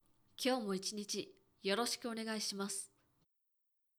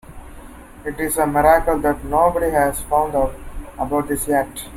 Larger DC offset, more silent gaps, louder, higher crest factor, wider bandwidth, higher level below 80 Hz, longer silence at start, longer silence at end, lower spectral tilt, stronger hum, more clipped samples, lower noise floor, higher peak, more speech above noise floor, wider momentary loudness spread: neither; neither; second, -39 LUFS vs -19 LUFS; about the same, 18 dB vs 18 dB; first, over 20 kHz vs 16.5 kHz; second, -84 dBFS vs -34 dBFS; first, 0.4 s vs 0.05 s; first, 1.15 s vs 0 s; second, -3 dB/octave vs -5 dB/octave; neither; neither; first, -83 dBFS vs -38 dBFS; second, -24 dBFS vs -2 dBFS; first, 43 dB vs 20 dB; second, 9 LU vs 14 LU